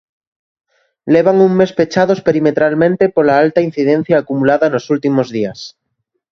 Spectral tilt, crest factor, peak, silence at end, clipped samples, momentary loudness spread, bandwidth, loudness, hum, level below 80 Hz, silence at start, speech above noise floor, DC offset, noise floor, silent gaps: -7 dB/octave; 14 dB; 0 dBFS; 0.65 s; under 0.1%; 8 LU; 7.2 kHz; -13 LUFS; none; -54 dBFS; 1.05 s; 58 dB; under 0.1%; -71 dBFS; none